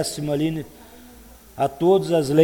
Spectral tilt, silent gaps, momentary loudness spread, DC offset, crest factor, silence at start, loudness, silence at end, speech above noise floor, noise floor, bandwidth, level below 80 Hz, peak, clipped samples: -6 dB/octave; none; 18 LU; under 0.1%; 18 dB; 0 s; -22 LUFS; 0 s; 26 dB; -46 dBFS; 19.5 kHz; -52 dBFS; -4 dBFS; under 0.1%